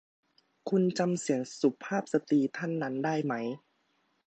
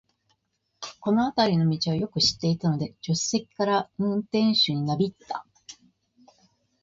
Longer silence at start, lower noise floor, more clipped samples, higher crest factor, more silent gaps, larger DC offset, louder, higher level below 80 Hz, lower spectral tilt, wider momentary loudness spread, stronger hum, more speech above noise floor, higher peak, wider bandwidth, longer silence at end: second, 0.65 s vs 0.8 s; about the same, -74 dBFS vs -75 dBFS; neither; about the same, 18 dB vs 18 dB; neither; neither; second, -31 LUFS vs -25 LUFS; second, -82 dBFS vs -60 dBFS; about the same, -6 dB/octave vs -5 dB/octave; second, 7 LU vs 14 LU; neither; second, 44 dB vs 50 dB; about the same, -12 dBFS vs -10 dBFS; first, 9 kHz vs 7.8 kHz; second, 0.7 s vs 1.1 s